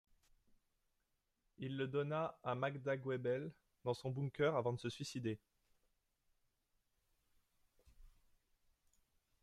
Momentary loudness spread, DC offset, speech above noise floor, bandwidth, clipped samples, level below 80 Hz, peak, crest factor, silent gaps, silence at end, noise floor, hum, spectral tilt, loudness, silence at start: 10 LU; under 0.1%; 44 dB; 13 kHz; under 0.1%; -76 dBFS; -24 dBFS; 20 dB; none; 1.35 s; -85 dBFS; none; -6.5 dB/octave; -42 LUFS; 1.6 s